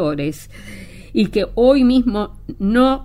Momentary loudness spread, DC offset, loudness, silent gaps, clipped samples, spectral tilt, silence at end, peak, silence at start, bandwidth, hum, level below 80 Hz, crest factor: 23 LU; under 0.1%; -17 LUFS; none; under 0.1%; -7 dB/octave; 0 s; -2 dBFS; 0 s; 15 kHz; none; -36 dBFS; 16 dB